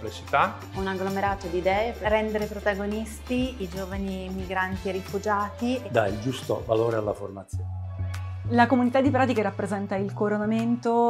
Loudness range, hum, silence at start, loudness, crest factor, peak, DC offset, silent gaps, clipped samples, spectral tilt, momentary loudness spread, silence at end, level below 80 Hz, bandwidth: 4 LU; none; 0 s; -27 LUFS; 20 dB; -6 dBFS; under 0.1%; none; under 0.1%; -6.5 dB/octave; 11 LU; 0 s; -44 dBFS; 14.5 kHz